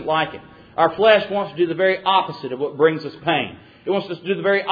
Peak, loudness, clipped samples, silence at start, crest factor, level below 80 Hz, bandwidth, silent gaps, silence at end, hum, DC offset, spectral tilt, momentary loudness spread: -2 dBFS; -20 LUFS; under 0.1%; 0 s; 18 dB; -60 dBFS; 5 kHz; none; 0 s; none; under 0.1%; -7.5 dB/octave; 12 LU